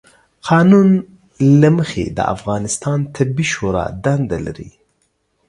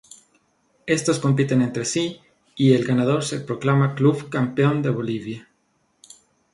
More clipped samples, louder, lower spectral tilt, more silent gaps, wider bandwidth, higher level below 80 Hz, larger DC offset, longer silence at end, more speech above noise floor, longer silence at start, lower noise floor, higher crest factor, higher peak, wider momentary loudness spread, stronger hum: neither; first, -15 LUFS vs -21 LUFS; about the same, -6.5 dB/octave vs -6 dB/octave; neither; about the same, 11.5 kHz vs 11.5 kHz; first, -42 dBFS vs -62 dBFS; neither; second, 0.8 s vs 1.1 s; about the same, 50 dB vs 47 dB; second, 0.45 s vs 0.85 s; about the same, -65 dBFS vs -67 dBFS; about the same, 16 dB vs 18 dB; first, 0 dBFS vs -4 dBFS; about the same, 11 LU vs 11 LU; neither